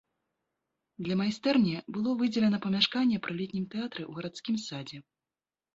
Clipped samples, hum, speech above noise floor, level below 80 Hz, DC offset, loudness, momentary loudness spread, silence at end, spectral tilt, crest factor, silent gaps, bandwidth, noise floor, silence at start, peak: under 0.1%; none; over 60 dB; -70 dBFS; under 0.1%; -30 LUFS; 13 LU; 0.75 s; -5.5 dB/octave; 22 dB; none; 7.8 kHz; under -90 dBFS; 1 s; -10 dBFS